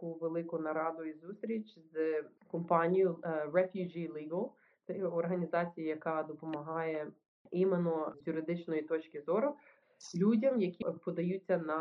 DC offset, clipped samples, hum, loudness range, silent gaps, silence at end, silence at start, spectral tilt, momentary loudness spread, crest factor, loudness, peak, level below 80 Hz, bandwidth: under 0.1%; under 0.1%; none; 3 LU; 7.28-7.45 s; 0 s; 0 s; -7 dB/octave; 12 LU; 20 dB; -36 LUFS; -14 dBFS; -84 dBFS; 7.6 kHz